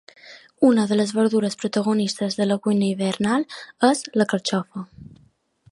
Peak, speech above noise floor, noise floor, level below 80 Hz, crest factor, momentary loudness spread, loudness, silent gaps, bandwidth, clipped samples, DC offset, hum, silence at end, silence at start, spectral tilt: -2 dBFS; 38 dB; -59 dBFS; -64 dBFS; 20 dB; 7 LU; -21 LUFS; none; 11.5 kHz; under 0.1%; under 0.1%; none; 0.7 s; 0.25 s; -5 dB/octave